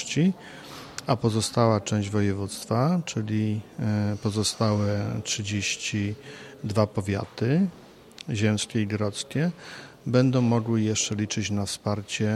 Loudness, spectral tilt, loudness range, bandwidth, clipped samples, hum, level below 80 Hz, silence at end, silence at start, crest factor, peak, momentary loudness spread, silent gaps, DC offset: -26 LUFS; -5 dB/octave; 2 LU; 13 kHz; under 0.1%; none; -62 dBFS; 0 s; 0 s; 20 dB; -6 dBFS; 11 LU; none; under 0.1%